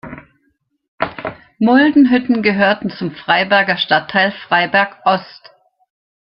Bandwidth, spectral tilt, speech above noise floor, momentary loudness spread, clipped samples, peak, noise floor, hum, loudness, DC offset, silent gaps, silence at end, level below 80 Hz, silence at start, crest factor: 5.6 kHz; -8.5 dB/octave; 50 dB; 13 LU; under 0.1%; 0 dBFS; -64 dBFS; none; -14 LUFS; under 0.1%; 0.88-0.98 s; 1.05 s; -56 dBFS; 0.05 s; 16 dB